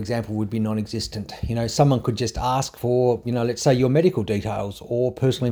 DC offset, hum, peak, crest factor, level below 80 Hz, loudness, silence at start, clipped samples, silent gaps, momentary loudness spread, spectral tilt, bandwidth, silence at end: under 0.1%; none; -4 dBFS; 18 dB; -42 dBFS; -23 LUFS; 0 s; under 0.1%; none; 9 LU; -6.5 dB/octave; over 20 kHz; 0 s